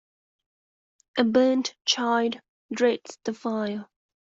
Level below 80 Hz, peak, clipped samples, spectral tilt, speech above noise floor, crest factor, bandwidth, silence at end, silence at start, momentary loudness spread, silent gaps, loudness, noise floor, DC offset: -74 dBFS; -6 dBFS; under 0.1%; -3.5 dB/octave; over 66 dB; 22 dB; 7.8 kHz; 0.5 s; 1.15 s; 13 LU; 2.49-2.69 s; -25 LUFS; under -90 dBFS; under 0.1%